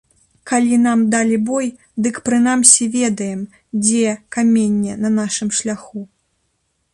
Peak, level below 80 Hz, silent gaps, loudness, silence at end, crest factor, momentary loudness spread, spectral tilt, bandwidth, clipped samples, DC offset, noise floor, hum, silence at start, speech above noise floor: 0 dBFS; -58 dBFS; none; -16 LUFS; 0.9 s; 18 dB; 14 LU; -3.5 dB/octave; 11.5 kHz; under 0.1%; under 0.1%; -67 dBFS; none; 0.45 s; 51 dB